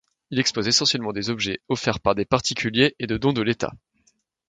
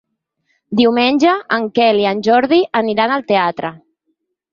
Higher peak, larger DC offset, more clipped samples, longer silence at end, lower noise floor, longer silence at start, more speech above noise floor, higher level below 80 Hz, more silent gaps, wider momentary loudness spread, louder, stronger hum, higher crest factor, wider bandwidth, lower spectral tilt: about the same, -2 dBFS vs -2 dBFS; neither; neither; about the same, 0.75 s vs 0.75 s; about the same, -66 dBFS vs -69 dBFS; second, 0.3 s vs 0.7 s; second, 43 dB vs 55 dB; first, -50 dBFS vs -60 dBFS; neither; about the same, 8 LU vs 7 LU; second, -22 LUFS vs -14 LUFS; neither; first, 22 dB vs 14 dB; first, 9.4 kHz vs 7.4 kHz; second, -3.5 dB/octave vs -5.5 dB/octave